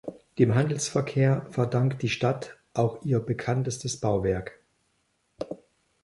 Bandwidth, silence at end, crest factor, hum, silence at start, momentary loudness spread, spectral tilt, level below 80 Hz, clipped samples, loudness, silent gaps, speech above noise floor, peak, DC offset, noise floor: 11.5 kHz; 0.5 s; 20 dB; none; 0.05 s; 15 LU; -6 dB/octave; -54 dBFS; under 0.1%; -27 LUFS; none; 47 dB; -8 dBFS; under 0.1%; -72 dBFS